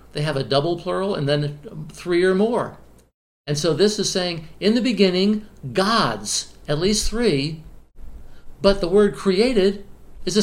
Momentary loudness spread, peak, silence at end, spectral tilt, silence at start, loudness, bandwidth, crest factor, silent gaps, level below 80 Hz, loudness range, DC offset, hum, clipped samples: 11 LU; -2 dBFS; 0 s; -4.5 dB/octave; 0.15 s; -20 LUFS; 16 kHz; 20 dB; 3.14-3.44 s; -38 dBFS; 2 LU; under 0.1%; none; under 0.1%